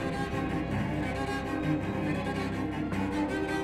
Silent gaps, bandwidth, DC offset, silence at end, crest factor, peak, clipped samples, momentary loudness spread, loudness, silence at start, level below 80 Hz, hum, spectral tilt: none; 14 kHz; under 0.1%; 0 s; 14 dB; -18 dBFS; under 0.1%; 2 LU; -32 LUFS; 0 s; -46 dBFS; none; -6.5 dB/octave